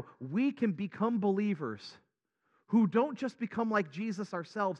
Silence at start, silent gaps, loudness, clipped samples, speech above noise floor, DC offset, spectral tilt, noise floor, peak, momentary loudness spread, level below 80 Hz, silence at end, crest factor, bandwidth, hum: 0 s; none; -33 LUFS; under 0.1%; 47 dB; under 0.1%; -7.5 dB/octave; -79 dBFS; -16 dBFS; 9 LU; -84 dBFS; 0 s; 16 dB; 8 kHz; none